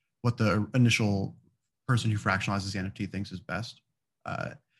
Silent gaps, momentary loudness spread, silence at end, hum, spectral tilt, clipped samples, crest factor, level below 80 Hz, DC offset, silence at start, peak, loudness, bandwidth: none; 14 LU; 0.25 s; none; -5.5 dB/octave; under 0.1%; 20 dB; -60 dBFS; under 0.1%; 0.25 s; -10 dBFS; -29 LUFS; 12 kHz